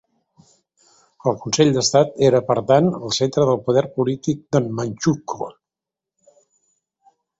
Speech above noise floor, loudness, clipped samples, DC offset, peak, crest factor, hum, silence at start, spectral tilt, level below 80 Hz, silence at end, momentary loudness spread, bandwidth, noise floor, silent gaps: 69 dB; -19 LUFS; under 0.1%; under 0.1%; -2 dBFS; 20 dB; none; 1.25 s; -5.5 dB/octave; -56 dBFS; 1.9 s; 9 LU; 8 kHz; -87 dBFS; none